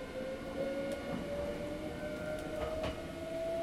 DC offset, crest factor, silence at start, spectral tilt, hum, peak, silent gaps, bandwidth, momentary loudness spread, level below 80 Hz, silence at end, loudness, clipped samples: under 0.1%; 14 dB; 0 s; -6 dB/octave; none; -24 dBFS; none; 16 kHz; 4 LU; -52 dBFS; 0 s; -40 LUFS; under 0.1%